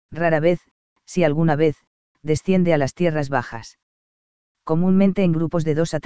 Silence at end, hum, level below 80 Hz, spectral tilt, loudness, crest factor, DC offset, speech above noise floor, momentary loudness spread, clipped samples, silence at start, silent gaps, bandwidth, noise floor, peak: 0 s; none; -50 dBFS; -7.5 dB/octave; -20 LUFS; 16 dB; 2%; over 71 dB; 13 LU; under 0.1%; 0.1 s; 0.71-0.96 s, 1.87-2.15 s, 3.83-4.55 s; 8 kHz; under -90 dBFS; -4 dBFS